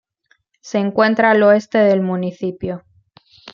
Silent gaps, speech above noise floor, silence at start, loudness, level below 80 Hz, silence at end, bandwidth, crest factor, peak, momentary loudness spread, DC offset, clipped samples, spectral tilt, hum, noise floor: none; 46 dB; 0.65 s; -16 LUFS; -56 dBFS; 0.05 s; 7.2 kHz; 16 dB; -2 dBFS; 14 LU; under 0.1%; under 0.1%; -6.5 dB/octave; none; -62 dBFS